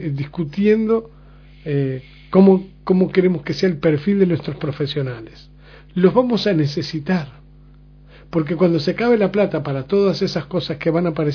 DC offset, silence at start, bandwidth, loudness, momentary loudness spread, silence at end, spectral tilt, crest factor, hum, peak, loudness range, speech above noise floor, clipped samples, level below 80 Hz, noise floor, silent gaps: under 0.1%; 0 s; 5.4 kHz; -19 LUFS; 10 LU; 0 s; -8 dB/octave; 18 dB; none; 0 dBFS; 3 LU; 27 dB; under 0.1%; -48 dBFS; -45 dBFS; none